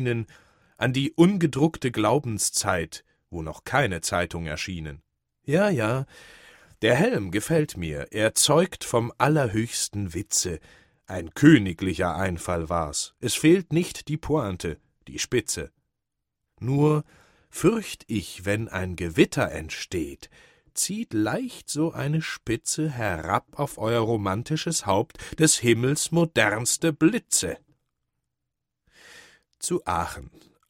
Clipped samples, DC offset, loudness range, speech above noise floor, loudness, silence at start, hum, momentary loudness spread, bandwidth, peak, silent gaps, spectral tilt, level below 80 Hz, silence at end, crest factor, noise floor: under 0.1%; under 0.1%; 5 LU; 59 dB; -25 LUFS; 0 s; none; 13 LU; 16.5 kHz; -2 dBFS; none; -4.5 dB/octave; -50 dBFS; 0.4 s; 22 dB; -84 dBFS